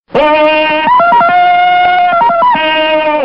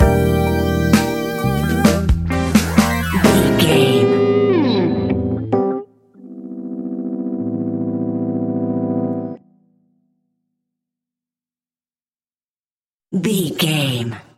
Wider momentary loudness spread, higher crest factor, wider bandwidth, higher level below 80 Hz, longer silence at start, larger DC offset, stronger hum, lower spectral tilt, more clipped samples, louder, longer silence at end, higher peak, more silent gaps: second, 3 LU vs 12 LU; second, 8 dB vs 18 dB; second, 5.6 kHz vs 17 kHz; second, -44 dBFS vs -32 dBFS; first, 0.15 s vs 0 s; first, 0.8% vs under 0.1%; neither; about the same, -6 dB/octave vs -6 dB/octave; neither; first, -8 LUFS vs -17 LUFS; second, 0 s vs 0.15 s; about the same, 0 dBFS vs 0 dBFS; second, none vs 12.50-12.54 s, 12.66-12.80 s, 12.86-13.00 s